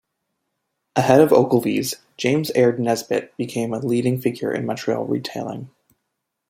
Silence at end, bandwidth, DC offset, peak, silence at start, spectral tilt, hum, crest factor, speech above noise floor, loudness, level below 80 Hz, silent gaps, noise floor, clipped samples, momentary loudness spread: 0.8 s; 16.5 kHz; under 0.1%; -2 dBFS; 0.95 s; -6 dB/octave; none; 20 dB; 58 dB; -20 LUFS; -62 dBFS; none; -78 dBFS; under 0.1%; 13 LU